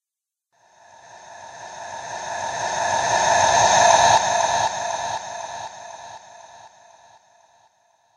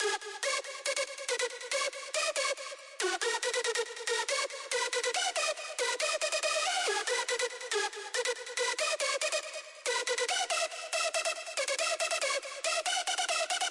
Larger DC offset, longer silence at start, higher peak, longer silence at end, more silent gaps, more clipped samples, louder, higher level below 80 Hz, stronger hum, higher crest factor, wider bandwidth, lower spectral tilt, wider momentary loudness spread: neither; first, 1.15 s vs 0 s; first, -2 dBFS vs -18 dBFS; first, 1.5 s vs 0 s; neither; neither; first, -19 LUFS vs -31 LUFS; first, -54 dBFS vs under -90 dBFS; neither; first, 22 dB vs 16 dB; about the same, 10.5 kHz vs 11.5 kHz; first, -1 dB/octave vs 4 dB/octave; first, 24 LU vs 4 LU